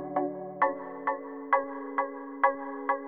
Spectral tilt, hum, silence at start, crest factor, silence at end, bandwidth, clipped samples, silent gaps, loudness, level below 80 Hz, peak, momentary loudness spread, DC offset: -8.5 dB/octave; none; 0 s; 20 dB; 0 s; 4.1 kHz; under 0.1%; none; -31 LUFS; -78 dBFS; -10 dBFS; 7 LU; under 0.1%